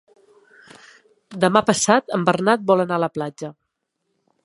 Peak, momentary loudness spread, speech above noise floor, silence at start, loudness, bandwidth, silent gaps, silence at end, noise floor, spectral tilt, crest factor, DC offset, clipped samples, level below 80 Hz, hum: 0 dBFS; 16 LU; 56 dB; 1.3 s; -19 LUFS; 11.5 kHz; none; 0.95 s; -75 dBFS; -4.5 dB/octave; 20 dB; under 0.1%; under 0.1%; -64 dBFS; none